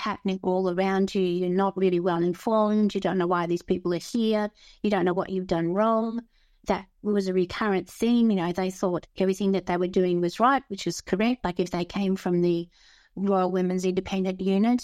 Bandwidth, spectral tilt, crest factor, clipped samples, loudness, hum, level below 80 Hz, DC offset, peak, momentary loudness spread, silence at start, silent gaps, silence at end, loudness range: 14 kHz; -6.5 dB/octave; 16 dB; under 0.1%; -26 LUFS; none; -56 dBFS; under 0.1%; -8 dBFS; 6 LU; 0 s; none; 0 s; 2 LU